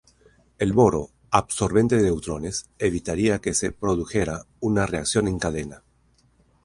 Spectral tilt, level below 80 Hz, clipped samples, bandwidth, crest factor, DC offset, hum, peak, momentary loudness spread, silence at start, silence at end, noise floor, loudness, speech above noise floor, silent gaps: -5 dB/octave; -42 dBFS; under 0.1%; 11.5 kHz; 22 dB; under 0.1%; none; -2 dBFS; 10 LU; 0.6 s; 0.85 s; -62 dBFS; -23 LUFS; 39 dB; none